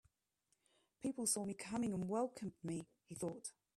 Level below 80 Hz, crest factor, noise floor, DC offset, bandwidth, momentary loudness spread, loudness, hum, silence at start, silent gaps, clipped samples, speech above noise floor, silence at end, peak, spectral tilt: -78 dBFS; 20 dB; -85 dBFS; under 0.1%; 14.5 kHz; 10 LU; -43 LUFS; none; 1 s; none; under 0.1%; 42 dB; 0.25 s; -24 dBFS; -4.5 dB/octave